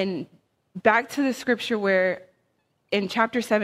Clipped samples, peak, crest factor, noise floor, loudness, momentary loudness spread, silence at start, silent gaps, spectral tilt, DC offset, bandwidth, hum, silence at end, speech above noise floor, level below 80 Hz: under 0.1%; -2 dBFS; 22 dB; -71 dBFS; -24 LUFS; 14 LU; 0 s; none; -5 dB/octave; under 0.1%; 15.5 kHz; none; 0 s; 47 dB; -68 dBFS